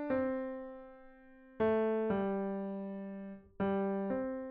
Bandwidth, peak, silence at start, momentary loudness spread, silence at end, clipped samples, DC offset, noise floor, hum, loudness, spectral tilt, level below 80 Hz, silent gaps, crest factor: 4.3 kHz; -22 dBFS; 0 s; 15 LU; 0 s; under 0.1%; under 0.1%; -58 dBFS; none; -36 LUFS; -7 dB/octave; -66 dBFS; none; 14 dB